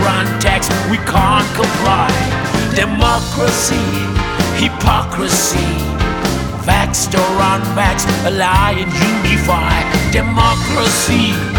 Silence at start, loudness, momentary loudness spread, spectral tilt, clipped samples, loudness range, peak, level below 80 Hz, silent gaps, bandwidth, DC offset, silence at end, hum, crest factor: 0 s; -14 LUFS; 4 LU; -4 dB/octave; under 0.1%; 2 LU; 0 dBFS; -24 dBFS; none; over 20 kHz; under 0.1%; 0 s; none; 14 dB